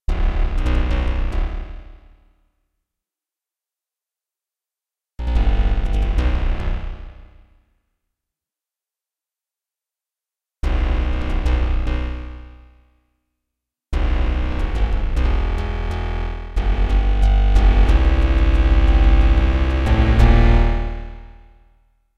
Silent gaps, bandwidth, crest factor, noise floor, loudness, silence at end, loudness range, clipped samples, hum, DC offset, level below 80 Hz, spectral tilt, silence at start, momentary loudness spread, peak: none; 6.4 kHz; 16 dB; -89 dBFS; -20 LUFS; 0 s; 13 LU; under 0.1%; none; under 0.1%; -18 dBFS; -7.5 dB/octave; 0 s; 14 LU; -2 dBFS